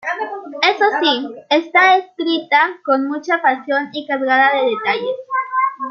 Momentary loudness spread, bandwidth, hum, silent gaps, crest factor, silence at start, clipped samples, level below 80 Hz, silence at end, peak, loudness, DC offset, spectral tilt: 9 LU; 6.8 kHz; none; none; 16 dB; 0.05 s; under 0.1%; -76 dBFS; 0 s; -2 dBFS; -16 LUFS; under 0.1%; -3 dB/octave